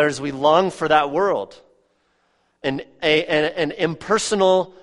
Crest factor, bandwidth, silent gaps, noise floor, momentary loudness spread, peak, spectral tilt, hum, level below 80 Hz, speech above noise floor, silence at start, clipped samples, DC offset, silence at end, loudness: 18 dB; 11.5 kHz; none; -65 dBFS; 10 LU; -2 dBFS; -4 dB/octave; none; -56 dBFS; 46 dB; 0 s; under 0.1%; under 0.1%; 0.1 s; -20 LUFS